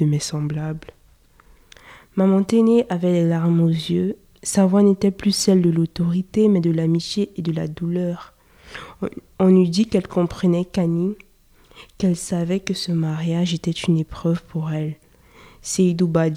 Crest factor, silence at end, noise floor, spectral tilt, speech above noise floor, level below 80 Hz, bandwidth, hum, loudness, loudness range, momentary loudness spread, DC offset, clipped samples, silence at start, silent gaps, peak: 16 dB; 0 s; -53 dBFS; -6.5 dB/octave; 34 dB; -50 dBFS; 13.5 kHz; none; -20 LUFS; 5 LU; 13 LU; under 0.1%; under 0.1%; 0 s; none; -4 dBFS